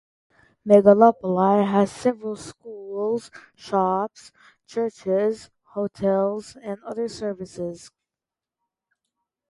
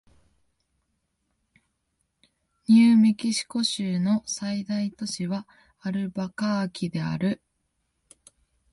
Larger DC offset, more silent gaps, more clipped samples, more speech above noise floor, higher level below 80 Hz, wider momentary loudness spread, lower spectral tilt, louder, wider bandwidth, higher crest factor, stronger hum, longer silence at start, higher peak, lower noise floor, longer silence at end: neither; neither; neither; first, 67 dB vs 52 dB; about the same, -64 dBFS vs -66 dBFS; first, 19 LU vs 13 LU; first, -7 dB/octave vs -5 dB/octave; first, -22 LUFS vs -25 LUFS; about the same, 11.5 kHz vs 11.5 kHz; about the same, 22 dB vs 18 dB; neither; second, 0.65 s vs 2.7 s; first, -2 dBFS vs -10 dBFS; first, -89 dBFS vs -76 dBFS; first, 1.75 s vs 1.35 s